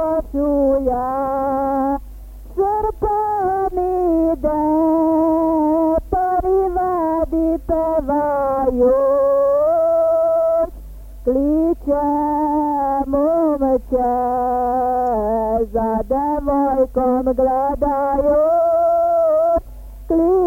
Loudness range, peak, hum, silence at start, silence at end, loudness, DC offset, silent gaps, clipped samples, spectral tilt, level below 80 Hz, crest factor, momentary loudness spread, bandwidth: 3 LU; -6 dBFS; none; 0 s; 0 s; -18 LUFS; under 0.1%; none; under 0.1%; -9.5 dB/octave; -36 dBFS; 10 dB; 5 LU; 16.5 kHz